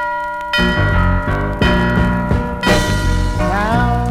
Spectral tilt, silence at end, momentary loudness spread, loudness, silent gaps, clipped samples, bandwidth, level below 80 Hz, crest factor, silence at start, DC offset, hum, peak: -6 dB/octave; 0 s; 4 LU; -16 LUFS; none; under 0.1%; 15.5 kHz; -22 dBFS; 14 dB; 0 s; under 0.1%; none; -2 dBFS